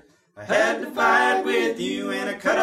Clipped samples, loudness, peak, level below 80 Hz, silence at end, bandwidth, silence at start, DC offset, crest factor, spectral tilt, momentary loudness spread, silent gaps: under 0.1%; -22 LUFS; -6 dBFS; -62 dBFS; 0 s; 15.5 kHz; 0.35 s; under 0.1%; 16 dB; -3.5 dB/octave; 9 LU; none